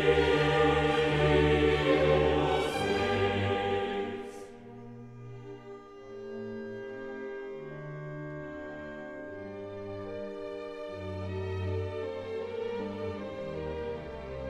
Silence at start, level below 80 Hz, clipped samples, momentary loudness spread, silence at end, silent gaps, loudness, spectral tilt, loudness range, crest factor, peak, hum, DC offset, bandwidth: 0 s; -46 dBFS; under 0.1%; 21 LU; 0 s; none; -31 LUFS; -6.5 dB/octave; 15 LU; 18 dB; -14 dBFS; none; under 0.1%; 12.5 kHz